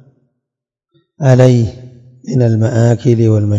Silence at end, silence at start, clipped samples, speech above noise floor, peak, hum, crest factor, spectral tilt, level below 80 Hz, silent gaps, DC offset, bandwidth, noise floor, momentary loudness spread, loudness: 0 s; 1.2 s; 0.6%; 71 dB; 0 dBFS; none; 12 dB; -8.5 dB/octave; -50 dBFS; none; under 0.1%; 7.8 kHz; -81 dBFS; 10 LU; -12 LUFS